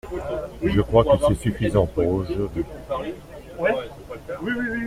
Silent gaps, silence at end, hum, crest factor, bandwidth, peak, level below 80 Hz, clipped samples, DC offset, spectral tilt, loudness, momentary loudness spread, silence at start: none; 0 s; none; 20 dB; 15.5 kHz; -4 dBFS; -38 dBFS; under 0.1%; under 0.1%; -7 dB/octave; -23 LUFS; 16 LU; 0.05 s